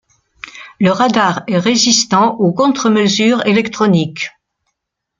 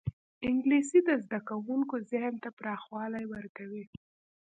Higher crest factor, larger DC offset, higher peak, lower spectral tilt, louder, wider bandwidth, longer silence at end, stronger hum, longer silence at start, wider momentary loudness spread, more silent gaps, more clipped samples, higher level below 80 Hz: about the same, 14 dB vs 18 dB; neither; first, 0 dBFS vs -14 dBFS; second, -4 dB/octave vs -6 dB/octave; first, -13 LUFS vs -32 LUFS; about the same, 9.2 kHz vs 9.4 kHz; first, 0.9 s vs 0.55 s; neither; first, 0.45 s vs 0.05 s; second, 14 LU vs 17 LU; second, none vs 0.13-0.41 s, 2.53-2.57 s, 3.49-3.55 s; neither; first, -56 dBFS vs -62 dBFS